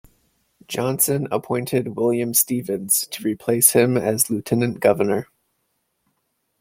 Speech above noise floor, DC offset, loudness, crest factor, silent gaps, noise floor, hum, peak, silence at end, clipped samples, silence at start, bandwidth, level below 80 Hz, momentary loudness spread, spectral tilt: 52 dB; under 0.1%; -20 LUFS; 22 dB; none; -72 dBFS; none; 0 dBFS; 1.35 s; under 0.1%; 0.7 s; 16.5 kHz; -60 dBFS; 10 LU; -4 dB/octave